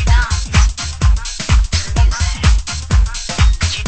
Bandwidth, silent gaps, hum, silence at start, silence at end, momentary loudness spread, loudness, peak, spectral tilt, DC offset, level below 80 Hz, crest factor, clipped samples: 8.8 kHz; none; none; 0 s; 0 s; 3 LU; -16 LUFS; 0 dBFS; -3.5 dB/octave; under 0.1%; -14 dBFS; 14 dB; under 0.1%